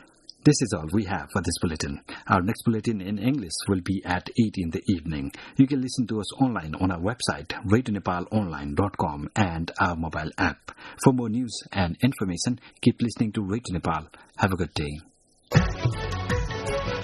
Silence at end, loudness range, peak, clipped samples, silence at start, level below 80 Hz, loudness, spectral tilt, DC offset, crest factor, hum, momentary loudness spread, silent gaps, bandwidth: 0 s; 2 LU; -2 dBFS; under 0.1%; 0.45 s; -42 dBFS; -26 LUFS; -5.5 dB/octave; under 0.1%; 24 dB; none; 7 LU; none; 12 kHz